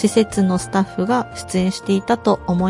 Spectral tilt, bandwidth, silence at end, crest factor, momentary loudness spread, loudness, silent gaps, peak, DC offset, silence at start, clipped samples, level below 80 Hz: -6 dB/octave; 11.5 kHz; 0 s; 16 dB; 4 LU; -19 LUFS; none; -2 dBFS; under 0.1%; 0 s; under 0.1%; -46 dBFS